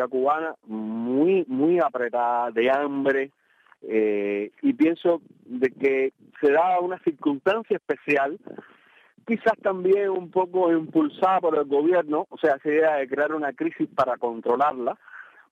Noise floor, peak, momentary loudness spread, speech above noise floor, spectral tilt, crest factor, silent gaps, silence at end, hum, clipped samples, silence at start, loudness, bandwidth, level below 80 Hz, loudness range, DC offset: -57 dBFS; -8 dBFS; 8 LU; 34 dB; -7.5 dB/octave; 14 dB; none; 0.3 s; none; under 0.1%; 0 s; -24 LUFS; 7.4 kHz; -72 dBFS; 3 LU; under 0.1%